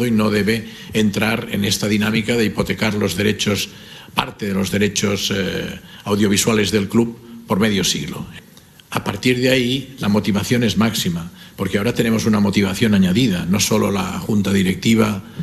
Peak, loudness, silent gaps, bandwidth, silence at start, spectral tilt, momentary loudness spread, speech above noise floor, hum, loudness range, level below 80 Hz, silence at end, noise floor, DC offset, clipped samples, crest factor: 0 dBFS; -18 LUFS; none; 14 kHz; 0 s; -4.5 dB/octave; 8 LU; 27 dB; none; 3 LU; -46 dBFS; 0 s; -45 dBFS; under 0.1%; under 0.1%; 18 dB